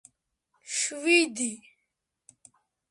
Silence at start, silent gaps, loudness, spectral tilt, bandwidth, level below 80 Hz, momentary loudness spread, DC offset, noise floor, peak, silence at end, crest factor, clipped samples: 0.65 s; none; -26 LUFS; -0.5 dB/octave; 11.5 kHz; -84 dBFS; 11 LU; under 0.1%; -81 dBFS; -10 dBFS; 1.35 s; 22 dB; under 0.1%